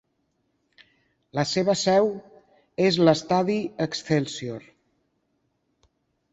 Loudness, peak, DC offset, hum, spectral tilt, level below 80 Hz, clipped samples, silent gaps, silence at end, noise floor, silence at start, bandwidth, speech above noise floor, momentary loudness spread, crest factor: -23 LUFS; -4 dBFS; under 0.1%; none; -5 dB/octave; -64 dBFS; under 0.1%; none; 1.7 s; -73 dBFS; 1.35 s; 8.2 kHz; 50 dB; 16 LU; 22 dB